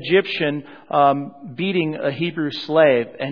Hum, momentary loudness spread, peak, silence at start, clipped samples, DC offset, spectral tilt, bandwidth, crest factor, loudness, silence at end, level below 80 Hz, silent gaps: none; 10 LU; -2 dBFS; 0 s; under 0.1%; 0.2%; -8 dB/octave; 5.4 kHz; 18 dB; -20 LUFS; 0 s; -68 dBFS; none